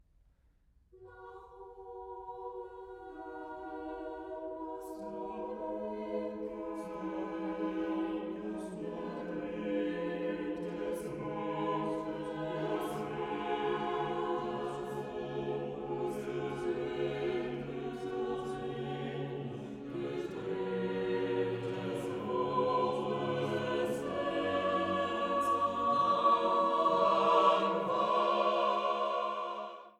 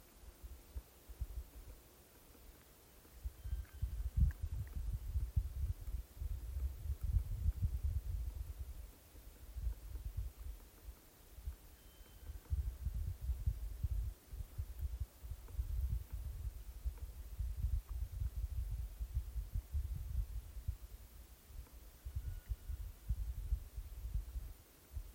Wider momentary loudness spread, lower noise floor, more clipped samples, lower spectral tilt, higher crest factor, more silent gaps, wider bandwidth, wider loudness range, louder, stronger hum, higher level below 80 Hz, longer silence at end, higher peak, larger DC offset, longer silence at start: second, 14 LU vs 17 LU; first, -68 dBFS vs -63 dBFS; neither; about the same, -6.5 dB/octave vs -6.5 dB/octave; about the same, 20 dB vs 20 dB; neither; about the same, 15 kHz vs 16.5 kHz; first, 14 LU vs 8 LU; first, -35 LUFS vs -46 LUFS; neither; second, -66 dBFS vs -44 dBFS; about the same, 0.1 s vs 0 s; first, -14 dBFS vs -22 dBFS; neither; first, 0.95 s vs 0 s